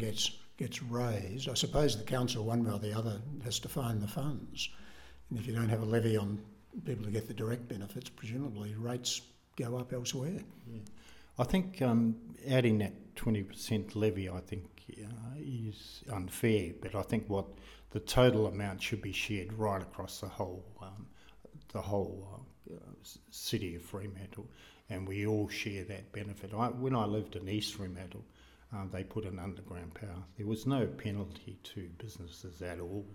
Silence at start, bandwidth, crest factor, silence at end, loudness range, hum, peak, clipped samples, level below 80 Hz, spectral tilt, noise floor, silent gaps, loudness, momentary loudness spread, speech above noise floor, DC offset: 0 s; 17.5 kHz; 24 dB; 0 s; 8 LU; none; -14 dBFS; under 0.1%; -56 dBFS; -5.5 dB/octave; -57 dBFS; none; -36 LUFS; 17 LU; 21 dB; under 0.1%